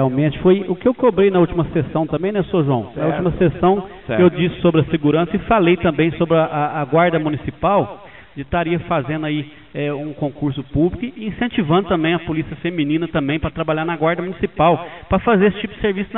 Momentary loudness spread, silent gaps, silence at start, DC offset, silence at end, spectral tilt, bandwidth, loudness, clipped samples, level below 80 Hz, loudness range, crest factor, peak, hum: 9 LU; none; 0 s; 0.4%; 0 s; -6 dB/octave; 4.1 kHz; -18 LUFS; under 0.1%; -40 dBFS; 5 LU; 16 dB; 0 dBFS; none